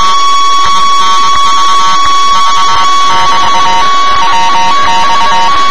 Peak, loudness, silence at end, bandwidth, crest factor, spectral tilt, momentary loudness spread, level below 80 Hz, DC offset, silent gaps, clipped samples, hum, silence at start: 0 dBFS; -7 LUFS; 0 s; 11 kHz; 8 dB; -1 dB/octave; 1 LU; -34 dBFS; 40%; none; 10%; none; 0 s